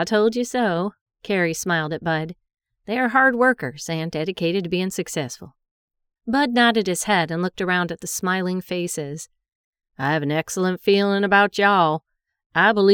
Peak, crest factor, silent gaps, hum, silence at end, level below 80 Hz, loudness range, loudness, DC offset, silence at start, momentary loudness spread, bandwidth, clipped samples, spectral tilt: -4 dBFS; 18 dB; 1.01-1.06 s, 5.71-5.88 s, 9.55-9.73 s, 12.46-12.50 s; none; 0 s; -60 dBFS; 4 LU; -21 LUFS; under 0.1%; 0 s; 11 LU; 19.5 kHz; under 0.1%; -4.5 dB/octave